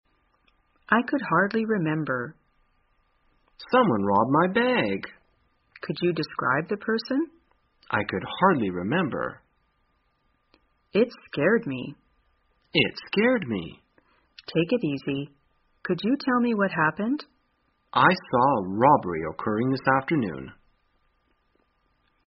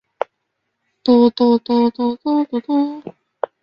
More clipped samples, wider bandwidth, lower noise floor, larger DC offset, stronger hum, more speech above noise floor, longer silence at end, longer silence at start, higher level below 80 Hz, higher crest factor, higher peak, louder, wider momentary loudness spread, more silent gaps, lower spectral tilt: neither; about the same, 5.8 kHz vs 5.6 kHz; second, -70 dBFS vs -74 dBFS; neither; neither; second, 46 dB vs 58 dB; first, 1.75 s vs 0.5 s; second, 0.9 s vs 1.05 s; about the same, -62 dBFS vs -62 dBFS; first, 22 dB vs 16 dB; about the same, -4 dBFS vs -2 dBFS; second, -25 LUFS vs -17 LUFS; second, 12 LU vs 15 LU; neither; second, -4 dB/octave vs -8 dB/octave